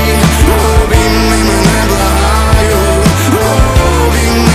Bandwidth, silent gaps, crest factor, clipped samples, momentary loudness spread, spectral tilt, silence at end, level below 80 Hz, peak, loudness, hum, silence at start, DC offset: 16 kHz; none; 8 dB; 1%; 1 LU; -5 dB/octave; 0 s; -14 dBFS; 0 dBFS; -9 LUFS; none; 0 s; under 0.1%